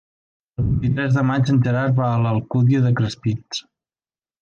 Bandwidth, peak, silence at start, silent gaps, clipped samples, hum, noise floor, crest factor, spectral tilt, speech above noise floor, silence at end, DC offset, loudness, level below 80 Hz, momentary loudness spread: 7.2 kHz; -8 dBFS; 0.6 s; none; under 0.1%; none; under -90 dBFS; 12 dB; -7.5 dB/octave; over 72 dB; 0.8 s; under 0.1%; -19 LUFS; -40 dBFS; 9 LU